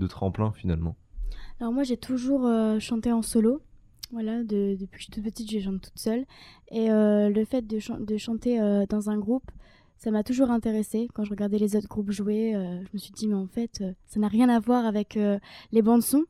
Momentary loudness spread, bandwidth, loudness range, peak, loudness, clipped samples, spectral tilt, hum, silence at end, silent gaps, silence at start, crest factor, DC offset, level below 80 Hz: 13 LU; 15 kHz; 3 LU; -8 dBFS; -27 LUFS; under 0.1%; -6.5 dB/octave; none; 0.05 s; none; 0 s; 18 dB; under 0.1%; -46 dBFS